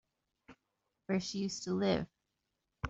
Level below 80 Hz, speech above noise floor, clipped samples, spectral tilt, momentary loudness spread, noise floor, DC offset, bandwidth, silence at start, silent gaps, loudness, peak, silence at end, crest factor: -66 dBFS; 51 dB; under 0.1%; -5 dB/octave; 13 LU; -85 dBFS; under 0.1%; 8 kHz; 0.5 s; none; -36 LUFS; -18 dBFS; 0 s; 20 dB